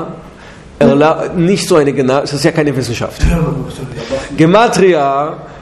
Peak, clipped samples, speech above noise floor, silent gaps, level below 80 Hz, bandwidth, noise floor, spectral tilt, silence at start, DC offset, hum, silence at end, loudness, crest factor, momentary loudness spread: 0 dBFS; 0.2%; 23 dB; none; -26 dBFS; 13 kHz; -34 dBFS; -6 dB/octave; 0 s; under 0.1%; none; 0 s; -12 LUFS; 12 dB; 12 LU